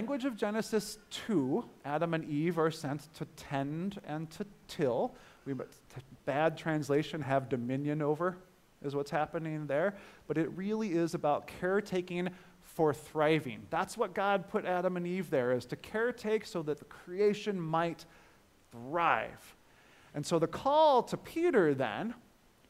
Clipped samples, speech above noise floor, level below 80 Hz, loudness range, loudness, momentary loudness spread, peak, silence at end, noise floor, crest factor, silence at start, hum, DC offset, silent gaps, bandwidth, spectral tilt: under 0.1%; 30 dB; -68 dBFS; 5 LU; -33 LUFS; 12 LU; -12 dBFS; 0.5 s; -63 dBFS; 20 dB; 0 s; none; under 0.1%; none; 16 kHz; -6 dB/octave